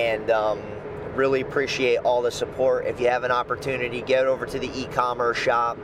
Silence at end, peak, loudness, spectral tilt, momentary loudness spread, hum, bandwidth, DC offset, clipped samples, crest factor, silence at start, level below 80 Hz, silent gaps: 0 s; -8 dBFS; -23 LUFS; -4.5 dB/octave; 7 LU; none; 15 kHz; under 0.1%; under 0.1%; 16 dB; 0 s; -50 dBFS; none